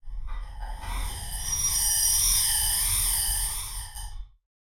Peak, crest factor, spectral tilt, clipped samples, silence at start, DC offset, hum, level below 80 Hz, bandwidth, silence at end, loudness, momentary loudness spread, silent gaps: -10 dBFS; 18 dB; 0.5 dB/octave; under 0.1%; 0.05 s; under 0.1%; none; -36 dBFS; 16.5 kHz; 0.4 s; -23 LUFS; 20 LU; none